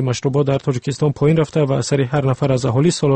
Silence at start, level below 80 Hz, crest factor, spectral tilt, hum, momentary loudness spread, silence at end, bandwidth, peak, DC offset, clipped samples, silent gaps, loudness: 0 s; -48 dBFS; 12 dB; -6.5 dB/octave; none; 4 LU; 0 s; 8.8 kHz; -4 dBFS; under 0.1%; under 0.1%; none; -17 LUFS